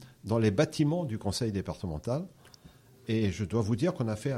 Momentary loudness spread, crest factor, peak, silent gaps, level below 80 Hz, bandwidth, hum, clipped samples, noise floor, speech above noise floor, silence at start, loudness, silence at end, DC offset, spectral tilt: 9 LU; 18 dB; -12 dBFS; none; -54 dBFS; 15 kHz; none; under 0.1%; -56 dBFS; 27 dB; 0 s; -31 LUFS; 0 s; under 0.1%; -6.5 dB/octave